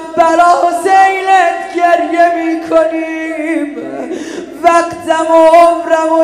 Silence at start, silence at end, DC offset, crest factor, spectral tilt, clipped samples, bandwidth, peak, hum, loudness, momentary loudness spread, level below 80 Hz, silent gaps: 0 s; 0 s; under 0.1%; 10 dB; -3.5 dB/octave; 0.6%; 13 kHz; 0 dBFS; none; -10 LUFS; 14 LU; -52 dBFS; none